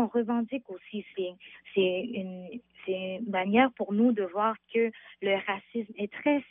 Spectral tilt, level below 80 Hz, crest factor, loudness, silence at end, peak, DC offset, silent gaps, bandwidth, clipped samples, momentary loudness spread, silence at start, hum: -4 dB/octave; -76 dBFS; 20 dB; -30 LUFS; 0.1 s; -10 dBFS; under 0.1%; none; 3.8 kHz; under 0.1%; 14 LU; 0 s; none